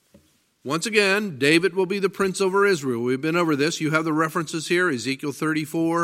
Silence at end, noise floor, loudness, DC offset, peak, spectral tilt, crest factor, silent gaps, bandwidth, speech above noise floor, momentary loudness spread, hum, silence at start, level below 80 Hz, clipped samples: 0 s; -58 dBFS; -22 LUFS; under 0.1%; -4 dBFS; -4.5 dB/octave; 18 dB; none; 16 kHz; 36 dB; 7 LU; none; 0.65 s; -68 dBFS; under 0.1%